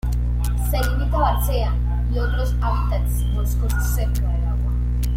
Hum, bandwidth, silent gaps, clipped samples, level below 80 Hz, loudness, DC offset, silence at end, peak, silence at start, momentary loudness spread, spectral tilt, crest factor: 60 Hz at -20 dBFS; 16 kHz; none; under 0.1%; -20 dBFS; -22 LUFS; under 0.1%; 0 s; -6 dBFS; 0.05 s; 3 LU; -6 dB/octave; 14 dB